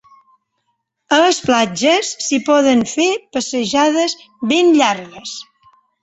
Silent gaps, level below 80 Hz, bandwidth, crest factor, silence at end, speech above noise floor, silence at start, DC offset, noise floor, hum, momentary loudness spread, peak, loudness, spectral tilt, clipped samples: none; -58 dBFS; 8.2 kHz; 16 dB; 0.6 s; 55 dB; 1.1 s; under 0.1%; -70 dBFS; none; 12 LU; -2 dBFS; -15 LUFS; -3 dB/octave; under 0.1%